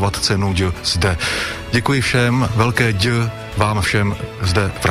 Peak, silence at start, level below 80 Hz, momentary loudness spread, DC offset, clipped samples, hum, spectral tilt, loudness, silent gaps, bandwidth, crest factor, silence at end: -2 dBFS; 0 s; -34 dBFS; 5 LU; under 0.1%; under 0.1%; none; -5 dB/octave; -17 LUFS; none; 15 kHz; 16 dB; 0 s